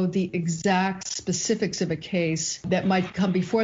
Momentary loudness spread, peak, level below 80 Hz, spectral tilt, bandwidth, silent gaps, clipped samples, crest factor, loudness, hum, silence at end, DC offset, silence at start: 4 LU; -10 dBFS; -58 dBFS; -5 dB/octave; 8 kHz; none; under 0.1%; 14 dB; -25 LUFS; none; 0 s; under 0.1%; 0 s